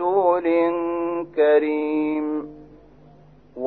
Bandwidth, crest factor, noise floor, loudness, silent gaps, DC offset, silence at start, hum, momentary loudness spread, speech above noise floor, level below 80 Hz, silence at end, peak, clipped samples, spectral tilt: 4.4 kHz; 16 dB; -50 dBFS; -21 LUFS; none; 0.1%; 0 s; none; 9 LU; 30 dB; -58 dBFS; 0 s; -6 dBFS; under 0.1%; -9.5 dB/octave